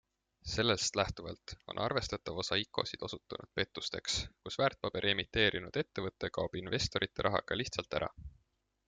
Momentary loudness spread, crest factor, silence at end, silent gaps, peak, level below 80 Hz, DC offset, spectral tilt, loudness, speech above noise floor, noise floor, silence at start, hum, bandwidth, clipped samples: 12 LU; 22 dB; 0.6 s; none; -14 dBFS; -56 dBFS; under 0.1%; -3.5 dB/octave; -35 LUFS; 42 dB; -78 dBFS; 0.45 s; none; 9.6 kHz; under 0.1%